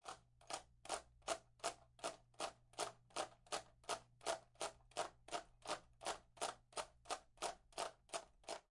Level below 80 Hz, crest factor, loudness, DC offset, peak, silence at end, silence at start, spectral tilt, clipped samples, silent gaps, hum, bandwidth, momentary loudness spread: -74 dBFS; 24 dB; -49 LUFS; under 0.1%; -26 dBFS; 0.1 s; 0.05 s; -1 dB/octave; under 0.1%; none; none; 11.5 kHz; 4 LU